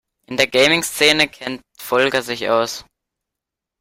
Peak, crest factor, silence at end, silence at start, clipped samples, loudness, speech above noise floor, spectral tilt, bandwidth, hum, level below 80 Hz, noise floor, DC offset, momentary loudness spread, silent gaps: 0 dBFS; 20 dB; 1 s; 0.3 s; under 0.1%; -16 LUFS; 66 dB; -2.5 dB/octave; 16 kHz; none; -56 dBFS; -84 dBFS; under 0.1%; 15 LU; none